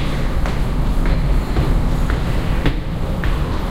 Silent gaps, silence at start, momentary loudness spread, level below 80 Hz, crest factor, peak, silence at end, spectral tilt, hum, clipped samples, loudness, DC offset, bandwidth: none; 0 s; 3 LU; -18 dBFS; 14 dB; -2 dBFS; 0 s; -7 dB/octave; none; under 0.1%; -21 LUFS; under 0.1%; 15 kHz